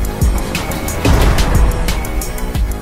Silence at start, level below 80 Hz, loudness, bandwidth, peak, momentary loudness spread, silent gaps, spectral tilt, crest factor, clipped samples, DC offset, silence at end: 0 s; -16 dBFS; -16 LUFS; 16.5 kHz; 0 dBFS; 8 LU; none; -5 dB/octave; 14 dB; under 0.1%; under 0.1%; 0 s